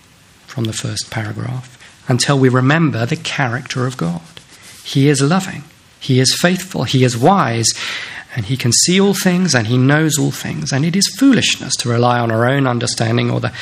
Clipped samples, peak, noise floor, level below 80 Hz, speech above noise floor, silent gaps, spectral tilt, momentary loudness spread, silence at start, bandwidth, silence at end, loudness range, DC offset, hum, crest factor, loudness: under 0.1%; 0 dBFS; -46 dBFS; -52 dBFS; 31 dB; none; -4.5 dB/octave; 12 LU; 0.5 s; 15.5 kHz; 0 s; 3 LU; under 0.1%; none; 16 dB; -15 LUFS